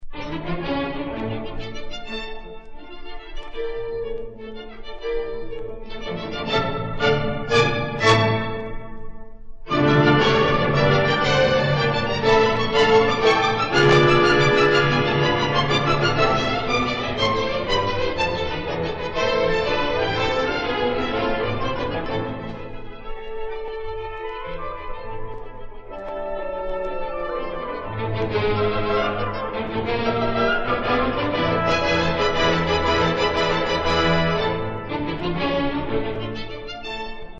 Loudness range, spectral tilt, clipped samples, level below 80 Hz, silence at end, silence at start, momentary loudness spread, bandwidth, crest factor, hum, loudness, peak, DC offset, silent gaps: 14 LU; -5.5 dB/octave; under 0.1%; -36 dBFS; 0 s; 0 s; 17 LU; 8.4 kHz; 18 dB; none; -21 LUFS; -4 dBFS; under 0.1%; none